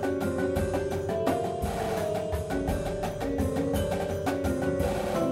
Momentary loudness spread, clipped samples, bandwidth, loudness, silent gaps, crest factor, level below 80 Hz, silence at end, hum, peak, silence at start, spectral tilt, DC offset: 3 LU; under 0.1%; 16 kHz; -29 LUFS; none; 14 dB; -42 dBFS; 0 s; none; -14 dBFS; 0 s; -6.5 dB/octave; under 0.1%